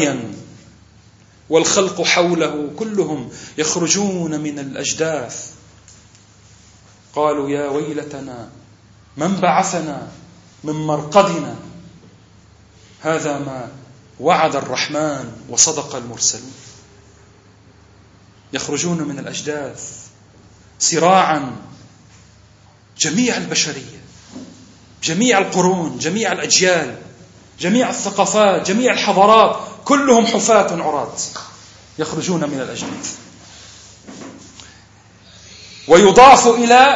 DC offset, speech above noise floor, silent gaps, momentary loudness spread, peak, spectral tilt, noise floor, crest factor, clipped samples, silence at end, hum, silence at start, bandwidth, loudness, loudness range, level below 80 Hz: under 0.1%; 32 dB; none; 21 LU; 0 dBFS; -3 dB/octave; -48 dBFS; 18 dB; under 0.1%; 0 s; none; 0 s; 9 kHz; -16 LUFS; 11 LU; -52 dBFS